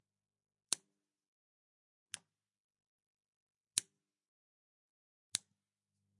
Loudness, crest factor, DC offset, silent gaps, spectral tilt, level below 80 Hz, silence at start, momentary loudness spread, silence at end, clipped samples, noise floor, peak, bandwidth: -42 LUFS; 42 dB; under 0.1%; 1.28-2.06 s, 2.60-2.69 s, 2.87-3.15 s, 3.28-3.47 s, 4.28-5.32 s; 1.5 dB/octave; under -90 dBFS; 0.7 s; 12 LU; 0.8 s; under 0.1%; under -90 dBFS; -10 dBFS; 11 kHz